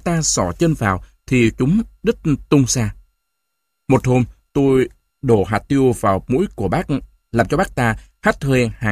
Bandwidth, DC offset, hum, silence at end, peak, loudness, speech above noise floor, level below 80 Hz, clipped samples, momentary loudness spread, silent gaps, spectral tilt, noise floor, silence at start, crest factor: 15.5 kHz; under 0.1%; none; 0 s; 0 dBFS; -18 LUFS; 59 dB; -38 dBFS; under 0.1%; 7 LU; none; -5.5 dB/octave; -75 dBFS; 0.05 s; 18 dB